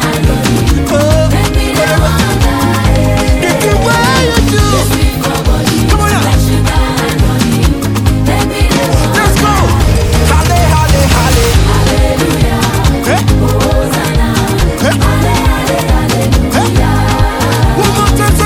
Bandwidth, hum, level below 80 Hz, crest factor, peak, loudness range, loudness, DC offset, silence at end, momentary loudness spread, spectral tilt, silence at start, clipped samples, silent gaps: 19.5 kHz; none; -14 dBFS; 8 dB; 0 dBFS; 2 LU; -10 LUFS; under 0.1%; 0 s; 3 LU; -5 dB/octave; 0 s; 0.2%; none